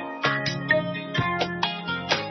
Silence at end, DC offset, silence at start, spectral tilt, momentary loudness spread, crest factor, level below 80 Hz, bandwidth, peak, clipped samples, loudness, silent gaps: 0 s; under 0.1%; 0 s; -4.5 dB/octave; 4 LU; 20 dB; -58 dBFS; 6.4 kHz; -6 dBFS; under 0.1%; -25 LUFS; none